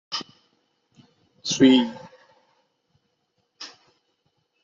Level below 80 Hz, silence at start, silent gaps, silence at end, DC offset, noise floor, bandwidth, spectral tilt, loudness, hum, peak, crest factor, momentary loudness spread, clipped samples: -68 dBFS; 0.1 s; none; 0.95 s; under 0.1%; -73 dBFS; 7.6 kHz; -4 dB/octave; -21 LUFS; none; -4 dBFS; 22 dB; 26 LU; under 0.1%